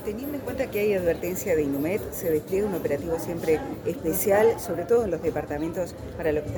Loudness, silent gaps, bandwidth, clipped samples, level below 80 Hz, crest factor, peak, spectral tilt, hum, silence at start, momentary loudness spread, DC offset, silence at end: -26 LUFS; none; 19.5 kHz; under 0.1%; -46 dBFS; 16 dB; -10 dBFS; -6 dB/octave; none; 0 s; 8 LU; under 0.1%; 0 s